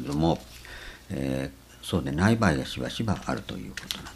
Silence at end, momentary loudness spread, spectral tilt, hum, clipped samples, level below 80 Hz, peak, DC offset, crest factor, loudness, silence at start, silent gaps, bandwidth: 0 s; 17 LU; -6 dB/octave; none; under 0.1%; -46 dBFS; -6 dBFS; under 0.1%; 22 dB; -28 LUFS; 0 s; none; 15.5 kHz